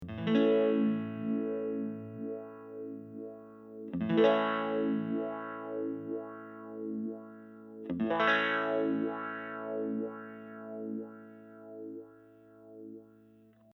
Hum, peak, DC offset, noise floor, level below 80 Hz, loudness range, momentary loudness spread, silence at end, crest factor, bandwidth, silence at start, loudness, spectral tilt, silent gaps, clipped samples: 60 Hz at -75 dBFS; -12 dBFS; under 0.1%; -61 dBFS; -72 dBFS; 9 LU; 22 LU; 0.7 s; 22 dB; 6.2 kHz; 0 s; -33 LUFS; -7.5 dB/octave; none; under 0.1%